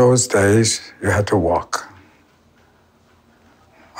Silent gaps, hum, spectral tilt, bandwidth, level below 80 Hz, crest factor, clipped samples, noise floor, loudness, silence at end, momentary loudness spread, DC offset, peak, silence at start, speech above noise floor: none; none; -4.5 dB/octave; 16 kHz; -46 dBFS; 16 dB; under 0.1%; -55 dBFS; -17 LUFS; 0 s; 9 LU; under 0.1%; -4 dBFS; 0 s; 38 dB